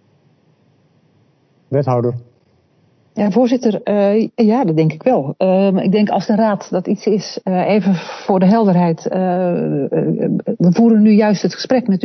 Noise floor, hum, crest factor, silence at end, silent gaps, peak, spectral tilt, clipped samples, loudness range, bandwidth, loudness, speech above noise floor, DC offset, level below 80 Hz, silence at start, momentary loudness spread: -56 dBFS; none; 14 dB; 0 s; none; 0 dBFS; -8 dB/octave; under 0.1%; 5 LU; 6.4 kHz; -15 LUFS; 42 dB; under 0.1%; -62 dBFS; 1.7 s; 8 LU